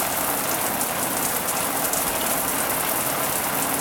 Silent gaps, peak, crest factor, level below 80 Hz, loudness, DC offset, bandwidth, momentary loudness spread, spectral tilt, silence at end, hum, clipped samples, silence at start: none; -8 dBFS; 16 dB; -50 dBFS; -22 LUFS; under 0.1%; 19 kHz; 1 LU; -1.5 dB/octave; 0 s; none; under 0.1%; 0 s